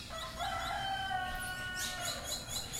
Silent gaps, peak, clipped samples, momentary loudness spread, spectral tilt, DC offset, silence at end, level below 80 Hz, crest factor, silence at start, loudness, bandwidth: none; -26 dBFS; under 0.1%; 3 LU; -1.5 dB/octave; under 0.1%; 0 s; -52 dBFS; 14 dB; 0 s; -37 LUFS; 16 kHz